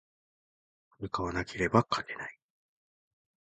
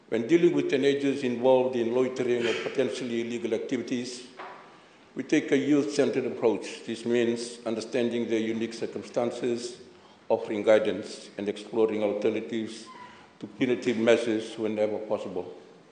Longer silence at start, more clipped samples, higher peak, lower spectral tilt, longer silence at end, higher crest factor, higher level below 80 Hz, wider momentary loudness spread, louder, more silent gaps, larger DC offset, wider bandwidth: first, 1 s vs 0.1 s; neither; about the same, -8 dBFS vs -8 dBFS; about the same, -6 dB/octave vs -5 dB/octave; first, 1.1 s vs 0.2 s; first, 26 dB vs 20 dB; first, -56 dBFS vs -78 dBFS; about the same, 15 LU vs 15 LU; second, -32 LUFS vs -27 LUFS; neither; neither; about the same, 9.2 kHz vs 9.6 kHz